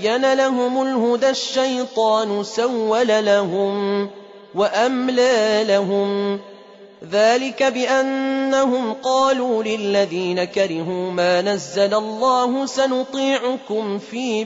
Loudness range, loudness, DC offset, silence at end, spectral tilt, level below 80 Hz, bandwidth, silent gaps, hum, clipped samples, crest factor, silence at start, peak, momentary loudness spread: 1 LU; -19 LUFS; under 0.1%; 0 s; -4 dB/octave; -68 dBFS; 8 kHz; none; none; under 0.1%; 14 dB; 0 s; -6 dBFS; 7 LU